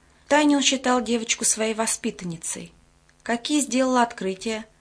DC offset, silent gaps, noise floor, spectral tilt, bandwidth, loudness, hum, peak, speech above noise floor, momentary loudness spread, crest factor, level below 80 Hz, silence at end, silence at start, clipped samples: under 0.1%; none; -57 dBFS; -2.5 dB/octave; 11 kHz; -23 LUFS; none; -6 dBFS; 34 dB; 11 LU; 18 dB; -60 dBFS; 0.15 s; 0.3 s; under 0.1%